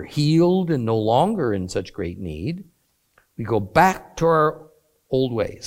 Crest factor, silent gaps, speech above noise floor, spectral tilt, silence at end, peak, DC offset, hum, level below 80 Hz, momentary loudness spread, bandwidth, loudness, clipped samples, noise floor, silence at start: 20 dB; none; 42 dB; -6.5 dB/octave; 0 s; -2 dBFS; under 0.1%; none; -48 dBFS; 13 LU; 16.5 kHz; -21 LUFS; under 0.1%; -62 dBFS; 0 s